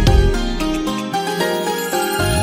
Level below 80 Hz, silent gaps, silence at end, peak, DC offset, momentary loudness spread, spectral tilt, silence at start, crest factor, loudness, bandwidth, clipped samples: -22 dBFS; none; 0 s; -2 dBFS; under 0.1%; 5 LU; -5 dB/octave; 0 s; 16 dB; -19 LUFS; 16.5 kHz; under 0.1%